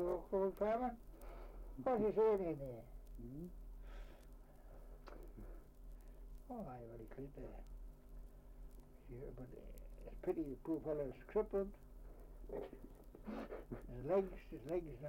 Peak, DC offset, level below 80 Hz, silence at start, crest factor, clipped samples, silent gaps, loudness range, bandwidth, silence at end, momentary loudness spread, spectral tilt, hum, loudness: -26 dBFS; under 0.1%; -56 dBFS; 0 s; 18 dB; under 0.1%; none; 15 LU; 16.5 kHz; 0 s; 22 LU; -8.5 dB/octave; none; -43 LUFS